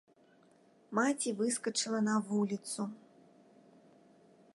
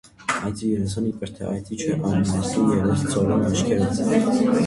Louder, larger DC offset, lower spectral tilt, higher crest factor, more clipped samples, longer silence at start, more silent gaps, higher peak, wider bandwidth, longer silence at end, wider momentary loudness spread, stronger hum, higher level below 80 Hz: second, -34 LUFS vs -22 LUFS; neither; second, -4 dB/octave vs -6 dB/octave; first, 20 dB vs 14 dB; neither; first, 0.9 s vs 0.2 s; neither; second, -18 dBFS vs -6 dBFS; about the same, 11.5 kHz vs 11.5 kHz; first, 1.6 s vs 0 s; about the same, 8 LU vs 8 LU; neither; second, -84 dBFS vs -44 dBFS